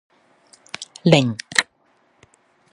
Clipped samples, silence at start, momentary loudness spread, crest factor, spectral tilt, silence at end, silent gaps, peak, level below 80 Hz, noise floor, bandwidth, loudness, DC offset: under 0.1%; 0.8 s; 19 LU; 24 dB; -4.5 dB/octave; 1.1 s; none; 0 dBFS; -62 dBFS; -62 dBFS; 11.5 kHz; -18 LUFS; under 0.1%